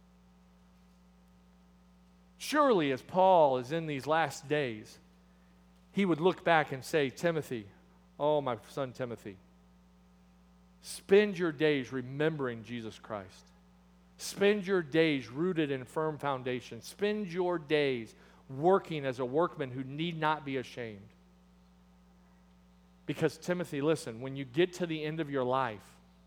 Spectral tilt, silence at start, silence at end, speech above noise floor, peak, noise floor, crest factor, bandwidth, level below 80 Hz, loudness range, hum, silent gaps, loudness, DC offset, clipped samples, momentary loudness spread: -5.5 dB/octave; 2.4 s; 0.45 s; 30 dB; -10 dBFS; -61 dBFS; 22 dB; 19.5 kHz; -68 dBFS; 8 LU; none; none; -32 LUFS; under 0.1%; under 0.1%; 16 LU